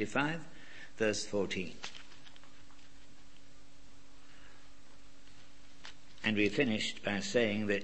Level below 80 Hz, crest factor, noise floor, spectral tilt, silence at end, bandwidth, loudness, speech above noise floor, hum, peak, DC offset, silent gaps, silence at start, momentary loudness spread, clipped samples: -64 dBFS; 22 dB; -61 dBFS; -4 dB/octave; 0 s; 8.4 kHz; -34 LUFS; 27 dB; none; -16 dBFS; 0.8%; none; 0 s; 22 LU; under 0.1%